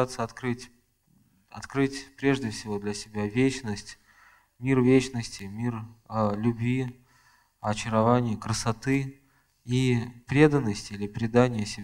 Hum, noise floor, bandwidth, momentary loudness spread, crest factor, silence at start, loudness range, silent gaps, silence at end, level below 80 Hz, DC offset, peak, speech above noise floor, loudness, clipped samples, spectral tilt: none; -65 dBFS; 13 kHz; 14 LU; 22 dB; 0 s; 4 LU; none; 0 s; -52 dBFS; under 0.1%; -6 dBFS; 39 dB; -27 LUFS; under 0.1%; -6 dB/octave